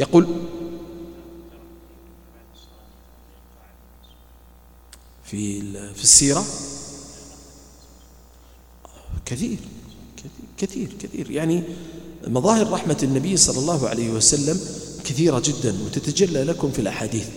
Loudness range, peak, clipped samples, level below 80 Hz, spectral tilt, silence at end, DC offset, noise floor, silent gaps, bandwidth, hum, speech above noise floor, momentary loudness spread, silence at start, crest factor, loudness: 15 LU; 0 dBFS; under 0.1%; -46 dBFS; -3.5 dB/octave; 0 s; under 0.1%; -49 dBFS; none; 18.5 kHz; none; 28 dB; 24 LU; 0 s; 24 dB; -20 LUFS